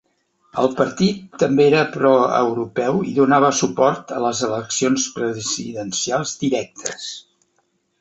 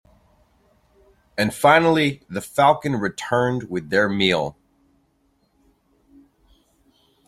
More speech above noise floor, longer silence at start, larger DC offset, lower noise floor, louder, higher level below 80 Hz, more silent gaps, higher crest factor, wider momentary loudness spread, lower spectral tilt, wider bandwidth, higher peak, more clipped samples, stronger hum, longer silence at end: about the same, 48 dB vs 45 dB; second, 0.55 s vs 1.35 s; neither; about the same, -67 dBFS vs -65 dBFS; about the same, -19 LUFS vs -20 LUFS; about the same, -60 dBFS vs -56 dBFS; neither; about the same, 18 dB vs 22 dB; about the same, 10 LU vs 12 LU; about the same, -4 dB/octave vs -5 dB/octave; second, 8.2 kHz vs 16 kHz; about the same, -2 dBFS vs -2 dBFS; neither; neither; second, 0.8 s vs 2.75 s